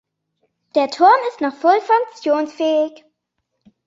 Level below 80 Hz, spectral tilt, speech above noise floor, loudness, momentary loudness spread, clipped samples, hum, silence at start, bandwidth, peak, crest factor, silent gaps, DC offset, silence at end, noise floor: -74 dBFS; -3 dB/octave; 58 dB; -17 LUFS; 9 LU; under 0.1%; none; 0.75 s; 7.8 kHz; -2 dBFS; 16 dB; none; under 0.1%; 1 s; -75 dBFS